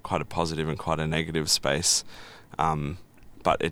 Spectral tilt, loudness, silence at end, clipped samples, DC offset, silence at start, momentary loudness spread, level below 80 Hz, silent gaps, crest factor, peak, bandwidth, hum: -3 dB/octave; -26 LUFS; 0 s; under 0.1%; under 0.1%; 0.05 s; 16 LU; -46 dBFS; none; 22 dB; -6 dBFS; 16.5 kHz; none